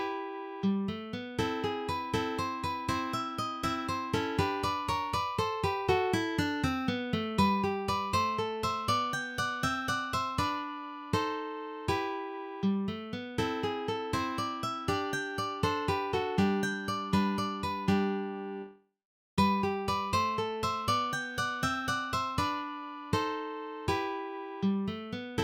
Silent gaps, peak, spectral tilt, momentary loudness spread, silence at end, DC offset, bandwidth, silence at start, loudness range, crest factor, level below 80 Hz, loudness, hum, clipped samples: 19.05-19.37 s; -14 dBFS; -5 dB/octave; 8 LU; 0 s; under 0.1%; 17 kHz; 0 s; 3 LU; 18 dB; -54 dBFS; -32 LUFS; none; under 0.1%